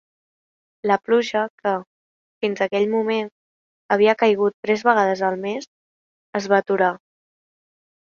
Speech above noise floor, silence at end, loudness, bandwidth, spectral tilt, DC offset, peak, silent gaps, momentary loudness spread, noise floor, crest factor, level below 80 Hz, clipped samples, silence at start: over 70 dB; 1.15 s; -21 LUFS; 7.2 kHz; -5.5 dB/octave; under 0.1%; -2 dBFS; 1.50-1.58 s, 1.87-2.41 s, 3.32-3.89 s, 4.54-4.63 s, 5.67-6.33 s; 11 LU; under -90 dBFS; 20 dB; -70 dBFS; under 0.1%; 0.85 s